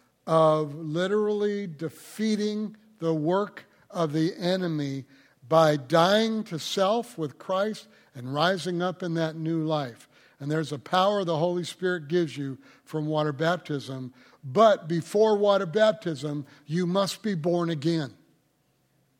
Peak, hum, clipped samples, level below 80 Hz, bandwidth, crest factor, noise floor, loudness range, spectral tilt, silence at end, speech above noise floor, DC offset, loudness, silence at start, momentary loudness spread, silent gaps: -8 dBFS; none; under 0.1%; -74 dBFS; 16.5 kHz; 20 dB; -69 dBFS; 5 LU; -6 dB/octave; 1.1 s; 43 dB; under 0.1%; -26 LUFS; 0.25 s; 15 LU; none